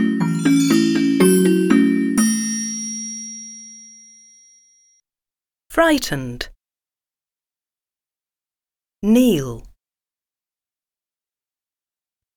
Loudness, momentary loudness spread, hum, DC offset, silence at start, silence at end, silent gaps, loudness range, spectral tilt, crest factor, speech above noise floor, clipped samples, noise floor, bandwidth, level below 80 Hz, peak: -17 LUFS; 18 LU; none; under 0.1%; 0 s; 2.7 s; none; 10 LU; -4.5 dB/octave; 18 dB; over 72 dB; under 0.1%; under -90 dBFS; 19 kHz; -48 dBFS; -2 dBFS